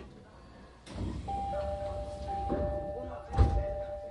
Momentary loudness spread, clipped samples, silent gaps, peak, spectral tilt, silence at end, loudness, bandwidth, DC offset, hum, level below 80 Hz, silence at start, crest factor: 23 LU; under 0.1%; none; -12 dBFS; -8 dB/octave; 0 s; -35 LUFS; 11 kHz; under 0.1%; none; -38 dBFS; 0 s; 22 dB